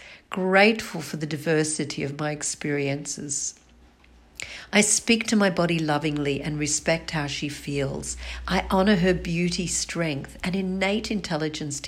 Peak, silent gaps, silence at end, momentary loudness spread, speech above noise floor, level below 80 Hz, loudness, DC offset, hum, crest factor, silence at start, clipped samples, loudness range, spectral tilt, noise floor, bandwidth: -6 dBFS; none; 0 s; 11 LU; 29 dB; -46 dBFS; -24 LUFS; under 0.1%; none; 20 dB; 0 s; under 0.1%; 5 LU; -4 dB/octave; -54 dBFS; 16 kHz